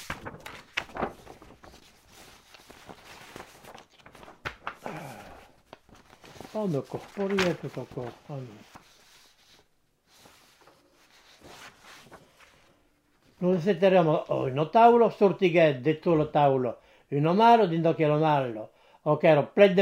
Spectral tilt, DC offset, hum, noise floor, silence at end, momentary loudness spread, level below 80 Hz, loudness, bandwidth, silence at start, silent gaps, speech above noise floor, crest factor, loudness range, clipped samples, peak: -7 dB/octave; under 0.1%; none; -67 dBFS; 0 s; 26 LU; -62 dBFS; -24 LUFS; 16 kHz; 0 s; none; 44 dB; 22 dB; 21 LU; under 0.1%; -4 dBFS